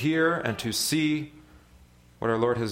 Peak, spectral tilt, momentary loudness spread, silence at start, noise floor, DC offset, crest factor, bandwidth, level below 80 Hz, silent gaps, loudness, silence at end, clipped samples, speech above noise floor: -10 dBFS; -4.5 dB/octave; 8 LU; 0 s; -55 dBFS; under 0.1%; 18 dB; 16.5 kHz; -58 dBFS; none; -26 LUFS; 0 s; under 0.1%; 29 dB